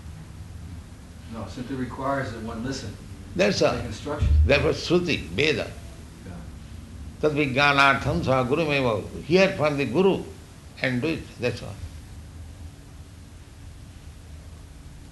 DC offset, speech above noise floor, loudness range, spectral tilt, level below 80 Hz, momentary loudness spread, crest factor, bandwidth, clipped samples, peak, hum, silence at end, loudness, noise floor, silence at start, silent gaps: under 0.1%; 21 dB; 12 LU; -5.5 dB/octave; -36 dBFS; 25 LU; 22 dB; 12 kHz; under 0.1%; -4 dBFS; none; 0 s; -24 LUFS; -44 dBFS; 0 s; none